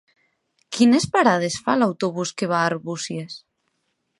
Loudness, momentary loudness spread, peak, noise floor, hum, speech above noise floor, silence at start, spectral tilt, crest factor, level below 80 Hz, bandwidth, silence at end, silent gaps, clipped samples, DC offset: -21 LUFS; 15 LU; -2 dBFS; -73 dBFS; none; 53 dB; 0.7 s; -4.5 dB/octave; 20 dB; -60 dBFS; 11.5 kHz; 0.8 s; none; under 0.1%; under 0.1%